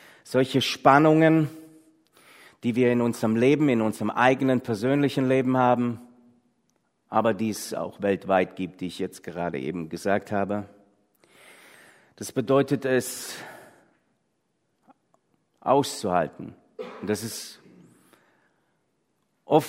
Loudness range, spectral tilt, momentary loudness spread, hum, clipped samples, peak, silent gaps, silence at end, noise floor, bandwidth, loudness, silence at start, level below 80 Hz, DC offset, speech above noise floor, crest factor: 9 LU; -5.5 dB/octave; 14 LU; none; under 0.1%; -2 dBFS; none; 0 s; -74 dBFS; 16 kHz; -24 LUFS; 0.25 s; -68 dBFS; under 0.1%; 50 dB; 24 dB